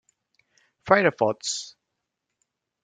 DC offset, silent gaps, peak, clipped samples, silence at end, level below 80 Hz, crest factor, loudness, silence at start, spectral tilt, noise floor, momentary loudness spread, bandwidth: under 0.1%; none; -2 dBFS; under 0.1%; 1.15 s; -68 dBFS; 26 dB; -23 LUFS; 0.85 s; -3.5 dB/octave; -82 dBFS; 22 LU; 9.6 kHz